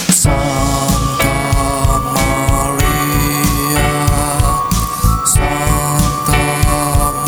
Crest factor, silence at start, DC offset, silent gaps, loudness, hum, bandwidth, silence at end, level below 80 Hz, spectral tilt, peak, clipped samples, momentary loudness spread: 12 dB; 0 s; 0.2%; none; -14 LUFS; none; over 20 kHz; 0 s; -20 dBFS; -4 dB/octave; 0 dBFS; under 0.1%; 2 LU